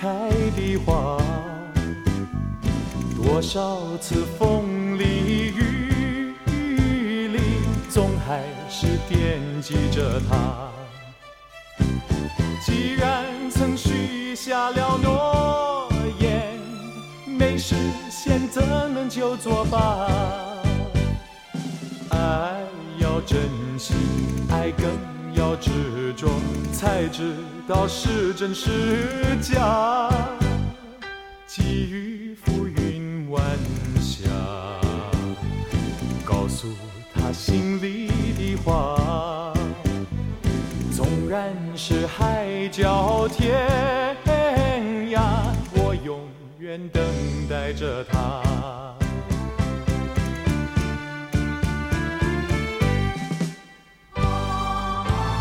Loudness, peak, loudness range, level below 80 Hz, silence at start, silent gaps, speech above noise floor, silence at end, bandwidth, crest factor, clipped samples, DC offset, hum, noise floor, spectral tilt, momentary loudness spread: -24 LUFS; -6 dBFS; 4 LU; -32 dBFS; 0 s; none; 27 dB; 0 s; 16.5 kHz; 18 dB; under 0.1%; under 0.1%; none; -49 dBFS; -6 dB/octave; 8 LU